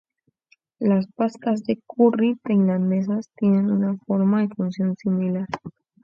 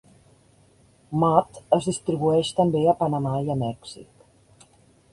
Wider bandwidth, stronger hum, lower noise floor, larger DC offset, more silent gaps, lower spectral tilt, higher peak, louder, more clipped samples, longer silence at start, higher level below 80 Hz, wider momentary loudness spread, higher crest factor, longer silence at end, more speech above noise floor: second, 7.2 kHz vs 11.5 kHz; neither; first, -63 dBFS vs -57 dBFS; neither; neither; first, -9.5 dB/octave vs -7 dB/octave; second, -6 dBFS vs -2 dBFS; about the same, -22 LUFS vs -23 LUFS; neither; second, 0.8 s vs 1.1 s; second, -66 dBFS vs -58 dBFS; second, 7 LU vs 11 LU; second, 16 dB vs 22 dB; second, 0.35 s vs 1.1 s; first, 42 dB vs 35 dB